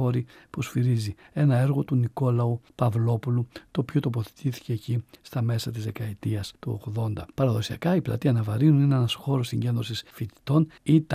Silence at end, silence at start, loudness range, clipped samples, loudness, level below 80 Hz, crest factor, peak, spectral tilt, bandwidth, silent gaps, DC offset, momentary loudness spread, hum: 0 s; 0 s; 5 LU; under 0.1%; -26 LUFS; -58 dBFS; 16 dB; -8 dBFS; -7.5 dB/octave; 15 kHz; none; under 0.1%; 10 LU; none